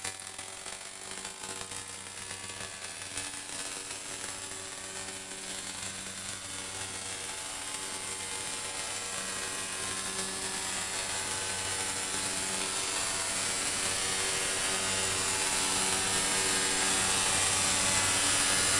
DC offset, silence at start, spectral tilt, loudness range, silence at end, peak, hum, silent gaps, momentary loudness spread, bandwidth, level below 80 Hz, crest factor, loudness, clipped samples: under 0.1%; 0 s; -0.5 dB/octave; 11 LU; 0 s; -14 dBFS; none; none; 13 LU; 11.5 kHz; -58 dBFS; 20 dB; -30 LUFS; under 0.1%